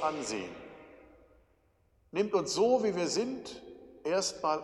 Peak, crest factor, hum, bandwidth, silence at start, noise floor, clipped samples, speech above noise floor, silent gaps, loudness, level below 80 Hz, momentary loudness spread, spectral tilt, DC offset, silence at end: -14 dBFS; 18 dB; none; 12 kHz; 0 s; -69 dBFS; under 0.1%; 38 dB; none; -32 LUFS; -68 dBFS; 21 LU; -3.5 dB/octave; under 0.1%; 0 s